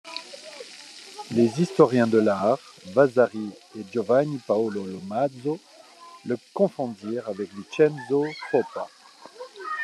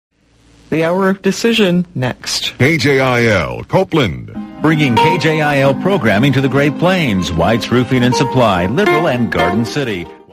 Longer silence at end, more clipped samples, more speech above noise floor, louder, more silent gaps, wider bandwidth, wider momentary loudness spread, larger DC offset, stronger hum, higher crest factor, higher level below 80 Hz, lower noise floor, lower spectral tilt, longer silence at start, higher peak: second, 0 s vs 0.15 s; neither; second, 24 dB vs 36 dB; second, -24 LUFS vs -13 LUFS; neither; second, 12 kHz vs 15.5 kHz; first, 20 LU vs 6 LU; neither; neither; first, 22 dB vs 12 dB; second, -76 dBFS vs -40 dBFS; about the same, -48 dBFS vs -49 dBFS; about the same, -6.5 dB/octave vs -5.5 dB/octave; second, 0.05 s vs 0.7 s; second, -4 dBFS vs 0 dBFS